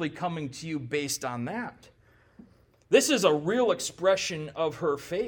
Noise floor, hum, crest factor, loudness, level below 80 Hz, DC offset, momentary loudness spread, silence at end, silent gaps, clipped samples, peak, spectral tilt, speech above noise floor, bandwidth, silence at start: -59 dBFS; none; 22 dB; -27 LUFS; -66 dBFS; under 0.1%; 11 LU; 0 s; none; under 0.1%; -6 dBFS; -3.5 dB/octave; 31 dB; 19 kHz; 0 s